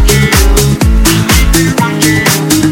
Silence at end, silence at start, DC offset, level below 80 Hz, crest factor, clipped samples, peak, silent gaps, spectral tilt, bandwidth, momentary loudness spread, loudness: 0 s; 0 s; under 0.1%; -12 dBFS; 8 dB; 0.4%; 0 dBFS; none; -4 dB/octave; 17.5 kHz; 2 LU; -8 LUFS